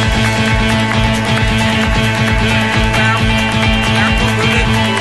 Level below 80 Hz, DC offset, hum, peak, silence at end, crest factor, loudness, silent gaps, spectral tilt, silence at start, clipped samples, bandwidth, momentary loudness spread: -22 dBFS; 1%; none; 0 dBFS; 0 s; 12 dB; -12 LUFS; none; -5 dB/octave; 0 s; under 0.1%; 12.5 kHz; 1 LU